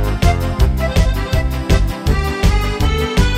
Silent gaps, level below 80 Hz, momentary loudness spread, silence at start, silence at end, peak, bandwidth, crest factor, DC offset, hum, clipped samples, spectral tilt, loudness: none; -16 dBFS; 2 LU; 0 s; 0 s; -2 dBFS; 16 kHz; 12 dB; under 0.1%; none; under 0.1%; -6 dB/octave; -17 LUFS